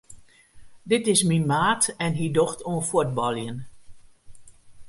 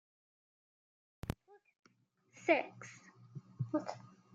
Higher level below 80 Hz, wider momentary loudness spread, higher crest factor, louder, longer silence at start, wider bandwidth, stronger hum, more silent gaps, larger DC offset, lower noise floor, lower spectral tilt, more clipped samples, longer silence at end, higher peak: first, -56 dBFS vs -66 dBFS; second, 8 LU vs 21 LU; second, 20 dB vs 28 dB; first, -23 LUFS vs -39 LUFS; second, 0.1 s vs 1.25 s; first, 11.5 kHz vs 9.6 kHz; neither; second, none vs 1.79-1.83 s; neither; second, -48 dBFS vs -73 dBFS; second, -4 dB/octave vs -6 dB/octave; neither; second, 0 s vs 0.3 s; first, -6 dBFS vs -16 dBFS